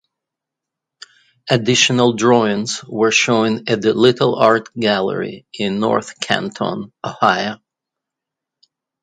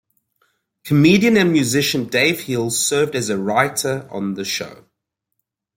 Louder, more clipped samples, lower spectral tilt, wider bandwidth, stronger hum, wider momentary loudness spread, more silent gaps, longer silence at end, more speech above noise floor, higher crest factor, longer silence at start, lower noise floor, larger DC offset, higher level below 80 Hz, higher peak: about the same, -16 LUFS vs -17 LUFS; neither; about the same, -4 dB/octave vs -4 dB/octave; second, 9.6 kHz vs 16.5 kHz; neither; about the same, 11 LU vs 11 LU; neither; first, 1.5 s vs 1.05 s; first, 67 dB vs 60 dB; about the same, 18 dB vs 18 dB; first, 1.45 s vs 0.85 s; first, -83 dBFS vs -78 dBFS; neither; about the same, -60 dBFS vs -58 dBFS; about the same, 0 dBFS vs -2 dBFS